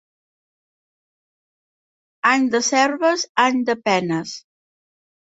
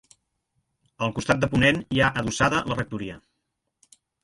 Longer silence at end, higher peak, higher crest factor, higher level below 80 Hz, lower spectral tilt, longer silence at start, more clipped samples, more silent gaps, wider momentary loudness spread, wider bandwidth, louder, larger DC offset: second, 0.85 s vs 1.05 s; about the same, -2 dBFS vs -4 dBFS; about the same, 20 dB vs 22 dB; second, -68 dBFS vs -48 dBFS; second, -3 dB/octave vs -5 dB/octave; first, 2.25 s vs 1 s; neither; first, 3.29-3.35 s vs none; about the same, 9 LU vs 11 LU; second, 8 kHz vs 11.5 kHz; first, -19 LUFS vs -23 LUFS; neither